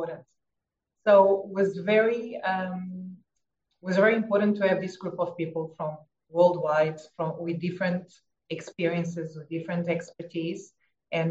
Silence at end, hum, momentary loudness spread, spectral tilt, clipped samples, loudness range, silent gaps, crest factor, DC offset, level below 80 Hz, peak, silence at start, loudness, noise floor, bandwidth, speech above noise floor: 0 s; none; 15 LU; -7 dB/octave; under 0.1%; 6 LU; none; 20 dB; under 0.1%; -78 dBFS; -8 dBFS; 0 s; -27 LUFS; -85 dBFS; 8 kHz; 59 dB